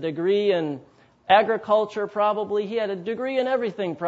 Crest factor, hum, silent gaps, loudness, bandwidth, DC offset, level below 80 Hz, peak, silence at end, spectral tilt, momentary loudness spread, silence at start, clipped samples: 20 dB; none; none; -23 LUFS; 7.8 kHz; under 0.1%; -70 dBFS; -4 dBFS; 0 s; -6.5 dB/octave; 9 LU; 0 s; under 0.1%